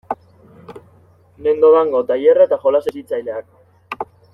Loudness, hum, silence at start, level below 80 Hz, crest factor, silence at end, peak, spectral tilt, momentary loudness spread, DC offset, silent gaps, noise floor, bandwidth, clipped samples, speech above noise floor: -15 LUFS; none; 0.1 s; -60 dBFS; 16 dB; 0.3 s; -2 dBFS; -6.5 dB/octave; 18 LU; under 0.1%; none; -50 dBFS; 5.4 kHz; under 0.1%; 36 dB